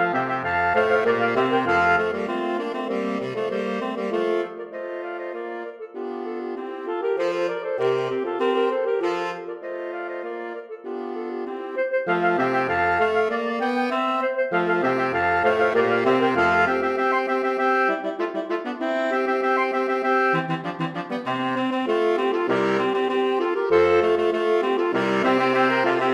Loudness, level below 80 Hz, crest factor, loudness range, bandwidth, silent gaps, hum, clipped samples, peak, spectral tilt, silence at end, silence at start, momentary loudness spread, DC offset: -23 LUFS; -60 dBFS; 16 dB; 7 LU; 10.5 kHz; none; none; under 0.1%; -6 dBFS; -6 dB/octave; 0 s; 0 s; 12 LU; under 0.1%